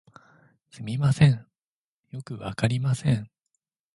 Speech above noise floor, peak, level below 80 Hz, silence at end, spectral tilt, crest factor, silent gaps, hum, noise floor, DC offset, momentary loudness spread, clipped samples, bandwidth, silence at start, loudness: over 66 dB; -6 dBFS; -54 dBFS; 0.7 s; -7 dB/octave; 22 dB; 1.63-2.04 s; none; under -90 dBFS; under 0.1%; 21 LU; under 0.1%; 11.5 kHz; 0.75 s; -25 LUFS